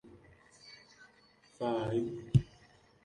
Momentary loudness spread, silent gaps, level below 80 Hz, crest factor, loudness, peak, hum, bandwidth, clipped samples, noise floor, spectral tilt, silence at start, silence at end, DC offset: 23 LU; none; -56 dBFS; 24 dB; -34 LUFS; -14 dBFS; none; 10.5 kHz; under 0.1%; -65 dBFS; -8 dB/octave; 0.05 s; 0.6 s; under 0.1%